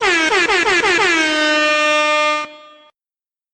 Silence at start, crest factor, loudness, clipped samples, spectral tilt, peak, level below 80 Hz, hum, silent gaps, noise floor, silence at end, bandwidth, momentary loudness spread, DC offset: 0 s; 12 dB; -14 LUFS; under 0.1%; -1 dB/octave; -4 dBFS; -50 dBFS; none; none; under -90 dBFS; 0.95 s; 12.5 kHz; 4 LU; under 0.1%